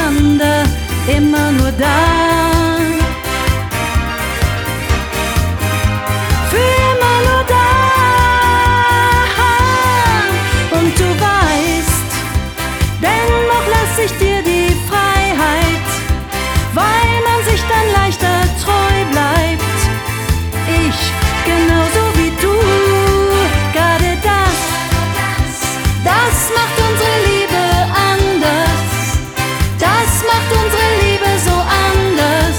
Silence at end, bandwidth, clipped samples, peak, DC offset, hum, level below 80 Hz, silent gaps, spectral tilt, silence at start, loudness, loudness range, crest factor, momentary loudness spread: 0 s; over 20 kHz; under 0.1%; 0 dBFS; under 0.1%; none; -22 dBFS; none; -4.5 dB/octave; 0 s; -13 LUFS; 3 LU; 12 dB; 6 LU